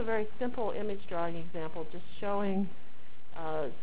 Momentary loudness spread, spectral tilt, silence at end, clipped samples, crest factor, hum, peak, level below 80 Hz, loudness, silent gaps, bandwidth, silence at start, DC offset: 10 LU; -9.5 dB/octave; 0 s; under 0.1%; 16 dB; none; -18 dBFS; -60 dBFS; -36 LUFS; none; 4 kHz; 0 s; 4%